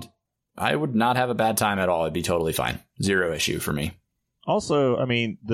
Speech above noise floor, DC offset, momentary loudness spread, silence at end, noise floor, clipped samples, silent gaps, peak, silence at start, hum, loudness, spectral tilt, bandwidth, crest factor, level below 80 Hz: 42 dB; under 0.1%; 6 LU; 0 s; -66 dBFS; under 0.1%; none; -6 dBFS; 0 s; none; -24 LUFS; -4.5 dB/octave; 16 kHz; 18 dB; -50 dBFS